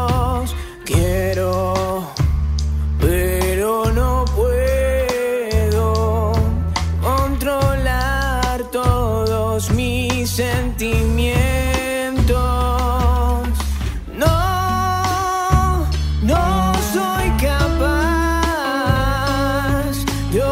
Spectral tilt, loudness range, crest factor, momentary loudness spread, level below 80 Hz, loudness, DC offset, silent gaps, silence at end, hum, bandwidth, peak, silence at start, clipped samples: -5.5 dB/octave; 1 LU; 14 dB; 4 LU; -22 dBFS; -18 LUFS; under 0.1%; none; 0 s; none; 16 kHz; -4 dBFS; 0 s; under 0.1%